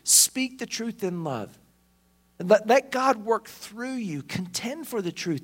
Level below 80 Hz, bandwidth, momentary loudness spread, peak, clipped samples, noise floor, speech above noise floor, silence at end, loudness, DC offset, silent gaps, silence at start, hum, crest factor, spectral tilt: -68 dBFS; 16.5 kHz; 15 LU; -4 dBFS; under 0.1%; -64 dBFS; 37 dB; 0 s; -25 LUFS; under 0.1%; none; 0.05 s; none; 22 dB; -2.5 dB/octave